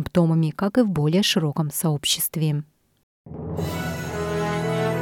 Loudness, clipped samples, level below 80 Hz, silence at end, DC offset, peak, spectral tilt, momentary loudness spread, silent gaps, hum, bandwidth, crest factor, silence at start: -23 LUFS; under 0.1%; -52 dBFS; 0 s; under 0.1%; -6 dBFS; -5 dB/octave; 9 LU; 3.03-3.24 s; none; 18 kHz; 16 dB; 0 s